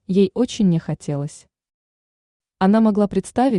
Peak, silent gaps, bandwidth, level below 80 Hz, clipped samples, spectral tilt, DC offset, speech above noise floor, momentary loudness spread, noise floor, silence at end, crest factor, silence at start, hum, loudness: -6 dBFS; 1.74-2.40 s; 11 kHz; -52 dBFS; under 0.1%; -7 dB/octave; under 0.1%; over 72 dB; 11 LU; under -90 dBFS; 0 s; 14 dB; 0.1 s; none; -19 LUFS